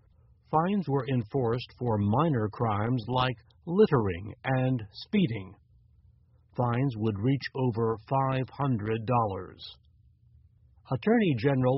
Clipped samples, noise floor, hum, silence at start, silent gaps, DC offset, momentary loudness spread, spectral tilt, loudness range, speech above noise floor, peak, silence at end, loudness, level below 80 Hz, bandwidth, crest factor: under 0.1%; -61 dBFS; none; 0.5 s; none; under 0.1%; 10 LU; -6.5 dB/octave; 3 LU; 33 dB; -10 dBFS; 0 s; -29 LUFS; -58 dBFS; 5.8 kHz; 18 dB